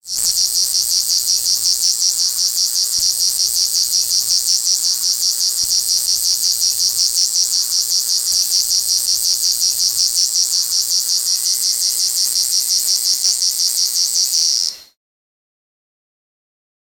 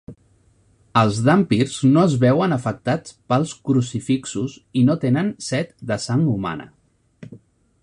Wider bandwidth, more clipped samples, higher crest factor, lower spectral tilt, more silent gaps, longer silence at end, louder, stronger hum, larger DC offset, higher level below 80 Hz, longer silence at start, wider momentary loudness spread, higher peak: first, 20 kHz vs 11 kHz; neither; about the same, 16 dB vs 18 dB; second, 4 dB/octave vs -6.5 dB/octave; neither; first, 2.15 s vs 0.45 s; first, -13 LUFS vs -20 LUFS; neither; neither; about the same, -56 dBFS vs -54 dBFS; about the same, 0.05 s vs 0.1 s; second, 1 LU vs 10 LU; about the same, -2 dBFS vs -2 dBFS